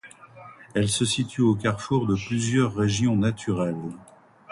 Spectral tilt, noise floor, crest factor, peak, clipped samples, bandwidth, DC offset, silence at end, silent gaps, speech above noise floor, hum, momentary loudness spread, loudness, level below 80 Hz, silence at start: -5.5 dB/octave; -47 dBFS; 16 dB; -8 dBFS; under 0.1%; 11.5 kHz; under 0.1%; 0.5 s; none; 23 dB; none; 8 LU; -24 LUFS; -52 dBFS; 0.05 s